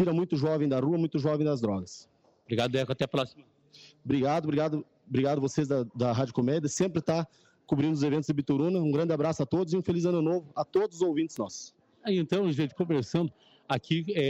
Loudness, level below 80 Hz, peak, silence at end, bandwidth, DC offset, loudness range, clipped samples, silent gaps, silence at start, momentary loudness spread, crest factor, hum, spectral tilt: -29 LUFS; -66 dBFS; -16 dBFS; 0 s; 9.2 kHz; under 0.1%; 3 LU; under 0.1%; none; 0 s; 7 LU; 12 dB; none; -6.5 dB/octave